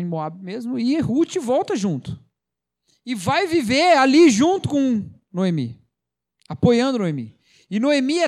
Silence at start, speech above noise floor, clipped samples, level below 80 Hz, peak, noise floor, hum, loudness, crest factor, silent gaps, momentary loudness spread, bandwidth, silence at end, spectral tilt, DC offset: 0 s; 66 dB; under 0.1%; -56 dBFS; -4 dBFS; -85 dBFS; none; -19 LUFS; 16 dB; none; 17 LU; 13 kHz; 0 s; -5.5 dB/octave; under 0.1%